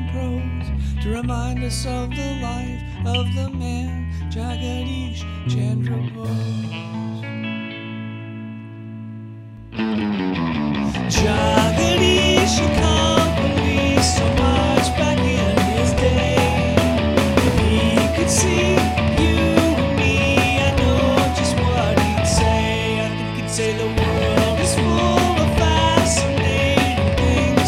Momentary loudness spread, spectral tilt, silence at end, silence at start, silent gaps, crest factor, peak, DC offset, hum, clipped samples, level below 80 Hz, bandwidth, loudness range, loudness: 12 LU; -5 dB/octave; 0 s; 0 s; none; 18 dB; 0 dBFS; under 0.1%; none; under 0.1%; -28 dBFS; 15.5 kHz; 9 LU; -19 LUFS